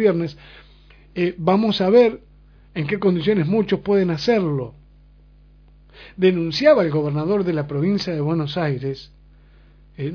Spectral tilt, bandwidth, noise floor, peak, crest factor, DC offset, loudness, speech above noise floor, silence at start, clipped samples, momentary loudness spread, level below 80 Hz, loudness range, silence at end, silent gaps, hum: -7.5 dB/octave; 5.4 kHz; -49 dBFS; -2 dBFS; 18 dB; under 0.1%; -20 LUFS; 30 dB; 0 s; under 0.1%; 14 LU; -50 dBFS; 3 LU; 0 s; none; 50 Hz at -45 dBFS